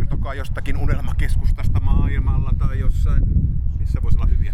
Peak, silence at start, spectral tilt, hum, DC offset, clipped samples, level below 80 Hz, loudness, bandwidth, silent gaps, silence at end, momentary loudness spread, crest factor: -4 dBFS; 0 s; -8 dB/octave; none; under 0.1%; under 0.1%; -18 dBFS; -22 LUFS; 11 kHz; none; 0 s; 5 LU; 12 dB